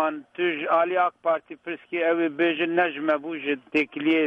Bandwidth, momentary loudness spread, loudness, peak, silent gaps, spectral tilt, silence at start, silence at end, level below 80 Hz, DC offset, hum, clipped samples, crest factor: 5.8 kHz; 7 LU; -24 LUFS; -10 dBFS; none; -6.5 dB/octave; 0 s; 0 s; -74 dBFS; under 0.1%; none; under 0.1%; 16 dB